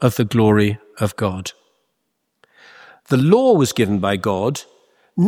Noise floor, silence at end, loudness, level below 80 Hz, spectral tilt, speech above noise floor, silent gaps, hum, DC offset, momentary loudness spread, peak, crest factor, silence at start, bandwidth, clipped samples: -73 dBFS; 0 s; -17 LUFS; -52 dBFS; -6.5 dB/octave; 56 dB; none; none; under 0.1%; 14 LU; -2 dBFS; 18 dB; 0 s; over 20 kHz; under 0.1%